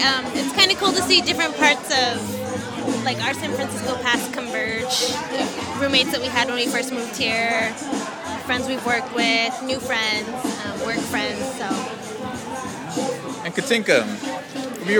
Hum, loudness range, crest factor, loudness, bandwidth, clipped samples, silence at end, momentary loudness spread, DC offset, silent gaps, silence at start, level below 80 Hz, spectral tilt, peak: none; 6 LU; 22 dB; -21 LUFS; 19.5 kHz; under 0.1%; 0 s; 12 LU; under 0.1%; none; 0 s; -56 dBFS; -2.5 dB/octave; 0 dBFS